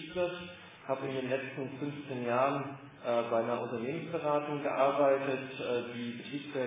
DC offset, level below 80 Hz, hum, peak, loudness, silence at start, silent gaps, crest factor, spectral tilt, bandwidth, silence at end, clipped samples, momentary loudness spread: under 0.1%; -74 dBFS; none; -16 dBFS; -34 LUFS; 0 s; none; 18 dB; -4.5 dB/octave; 3.9 kHz; 0 s; under 0.1%; 11 LU